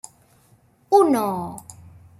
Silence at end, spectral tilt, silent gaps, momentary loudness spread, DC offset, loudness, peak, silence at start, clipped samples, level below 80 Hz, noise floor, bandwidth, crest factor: 0.5 s; -6 dB/octave; none; 18 LU; under 0.1%; -20 LUFS; -4 dBFS; 0.9 s; under 0.1%; -62 dBFS; -57 dBFS; 15.5 kHz; 20 dB